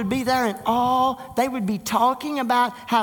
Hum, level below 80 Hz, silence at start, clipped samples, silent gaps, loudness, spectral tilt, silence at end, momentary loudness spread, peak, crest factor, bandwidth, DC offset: none; -54 dBFS; 0 s; under 0.1%; none; -22 LUFS; -4.5 dB/octave; 0 s; 4 LU; -6 dBFS; 16 dB; 19 kHz; under 0.1%